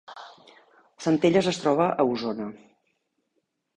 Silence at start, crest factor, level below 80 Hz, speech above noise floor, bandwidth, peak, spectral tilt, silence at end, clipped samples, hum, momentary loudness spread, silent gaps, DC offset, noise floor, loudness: 0.1 s; 20 dB; -64 dBFS; 53 dB; 10 kHz; -8 dBFS; -6 dB/octave; 1.2 s; under 0.1%; none; 17 LU; none; under 0.1%; -76 dBFS; -24 LUFS